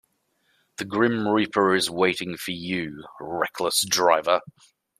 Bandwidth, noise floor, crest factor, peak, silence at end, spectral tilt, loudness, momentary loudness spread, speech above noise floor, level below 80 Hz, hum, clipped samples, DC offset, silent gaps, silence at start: 15 kHz; -69 dBFS; 20 dB; -4 dBFS; 0.5 s; -3 dB/octave; -23 LUFS; 14 LU; 46 dB; -66 dBFS; none; under 0.1%; under 0.1%; none; 0.8 s